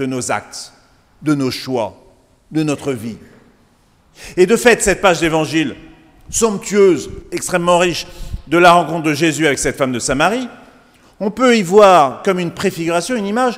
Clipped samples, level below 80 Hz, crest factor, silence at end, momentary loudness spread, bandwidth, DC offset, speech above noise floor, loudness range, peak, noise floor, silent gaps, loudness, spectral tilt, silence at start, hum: under 0.1%; -40 dBFS; 16 dB; 0 s; 15 LU; 16 kHz; under 0.1%; 39 dB; 8 LU; 0 dBFS; -53 dBFS; none; -15 LUFS; -4 dB/octave; 0 s; none